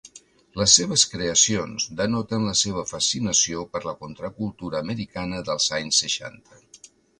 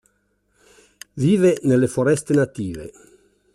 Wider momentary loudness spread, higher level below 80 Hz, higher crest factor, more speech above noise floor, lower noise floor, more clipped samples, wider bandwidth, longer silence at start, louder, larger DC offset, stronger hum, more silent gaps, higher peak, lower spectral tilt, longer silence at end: second, 15 LU vs 19 LU; about the same, -52 dBFS vs -56 dBFS; first, 24 dB vs 16 dB; second, 27 dB vs 48 dB; second, -51 dBFS vs -67 dBFS; neither; second, 11.5 kHz vs 13 kHz; second, 0.05 s vs 1.15 s; second, -22 LUFS vs -19 LUFS; neither; second, none vs 50 Hz at -50 dBFS; neither; first, 0 dBFS vs -6 dBFS; second, -2 dB/octave vs -7 dB/octave; second, 0.45 s vs 0.65 s